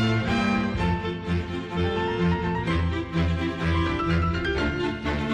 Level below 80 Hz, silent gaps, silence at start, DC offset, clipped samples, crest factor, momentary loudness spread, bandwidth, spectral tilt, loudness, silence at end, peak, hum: -36 dBFS; none; 0 s; under 0.1%; under 0.1%; 12 dB; 5 LU; 9.2 kHz; -7 dB/octave; -25 LUFS; 0 s; -14 dBFS; none